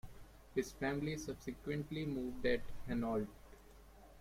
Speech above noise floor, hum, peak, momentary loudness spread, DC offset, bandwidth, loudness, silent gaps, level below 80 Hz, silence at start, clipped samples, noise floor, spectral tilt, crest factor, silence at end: 20 dB; none; -22 dBFS; 23 LU; under 0.1%; 16.5 kHz; -41 LUFS; none; -56 dBFS; 0.05 s; under 0.1%; -60 dBFS; -6 dB/octave; 20 dB; 0 s